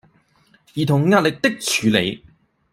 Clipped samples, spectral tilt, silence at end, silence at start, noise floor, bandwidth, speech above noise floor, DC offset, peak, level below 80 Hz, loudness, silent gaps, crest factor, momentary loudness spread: under 0.1%; -4.5 dB/octave; 0.55 s; 0.75 s; -58 dBFS; 16 kHz; 40 dB; under 0.1%; -2 dBFS; -56 dBFS; -18 LUFS; none; 18 dB; 12 LU